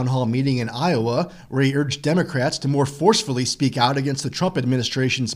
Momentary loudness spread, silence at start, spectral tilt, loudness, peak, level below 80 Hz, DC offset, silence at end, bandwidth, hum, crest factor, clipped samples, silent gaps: 5 LU; 0 s; -5 dB/octave; -21 LUFS; -2 dBFS; -54 dBFS; under 0.1%; 0 s; 13.5 kHz; none; 18 dB; under 0.1%; none